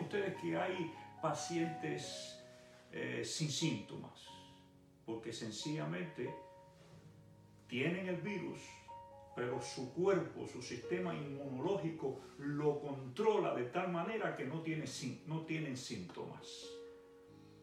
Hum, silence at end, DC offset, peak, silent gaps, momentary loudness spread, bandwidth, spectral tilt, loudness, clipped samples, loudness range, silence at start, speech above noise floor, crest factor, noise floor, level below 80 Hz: none; 0 s; under 0.1%; -22 dBFS; none; 19 LU; 15 kHz; -5 dB/octave; -41 LUFS; under 0.1%; 6 LU; 0 s; 24 dB; 20 dB; -64 dBFS; -78 dBFS